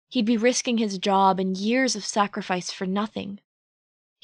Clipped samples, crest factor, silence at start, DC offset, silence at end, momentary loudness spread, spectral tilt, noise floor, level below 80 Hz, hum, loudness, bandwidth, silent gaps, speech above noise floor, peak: under 0.1%; 16 dB; 0.1 s; under 0.1%; 0.85 s; 10 LU; -4 dB/octave; under -90 dBFS; -70 dBFS; none; -24 LUFS; 11 kHz; none; over 66 dB; -8 dBFS